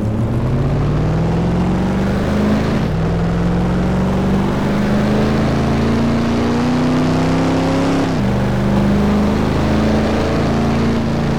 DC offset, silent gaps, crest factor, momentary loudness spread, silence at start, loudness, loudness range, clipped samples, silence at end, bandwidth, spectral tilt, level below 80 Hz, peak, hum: 3%; none; 10 dB; 2 LU; 0 s; -16 LUFS; 1 LU; under 0.1%; 0 s; 15 kHz; -7.5 dB/octave; -26 dBFS; -6 dBFS; none